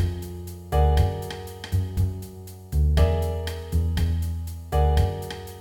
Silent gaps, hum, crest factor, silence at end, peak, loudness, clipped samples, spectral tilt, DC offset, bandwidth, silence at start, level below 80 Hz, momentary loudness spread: none; none; 16 dB; 0 s; -8 dBFS; -25 LUFS; under 0.1%; -7 dB/octave; under 0.1%; 17 kHz; 0 s; -26 dBFS; 14 LU